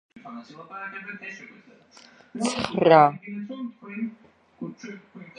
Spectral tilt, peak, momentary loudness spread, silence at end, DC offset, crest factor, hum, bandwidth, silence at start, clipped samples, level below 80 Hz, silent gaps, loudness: -5.5 dB/octave; -2 dBFS; 25 LU; 0.1 s; under 0.1%; 24 dB; none; 11 kHz; 0.15 s; under 0.1%; -66 dBFS; none; -23 LUFS